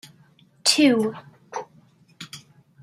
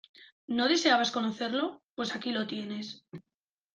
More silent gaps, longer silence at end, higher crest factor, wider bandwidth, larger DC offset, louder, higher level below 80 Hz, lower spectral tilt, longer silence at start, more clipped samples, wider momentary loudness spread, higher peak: second, none vs 0.32-0.48 s, 1.91-1.96 s; about the same, 0.45 s vs 0.55 s; about the same, 22 dB vs 22 dB; first, 15.5 kHz vs 9.4 kHz; neither; first, -20 LUFS vs -30 LUFS; about the same, -72 dBFS vs -76 dBFS; about the same, -2.5 dB/octave vs -3 dB/octave; first, 0.65 s vs 0.2 s; neither; first, 25 LU vs 18 LU; first, -4 dBFS vs -10 dBFS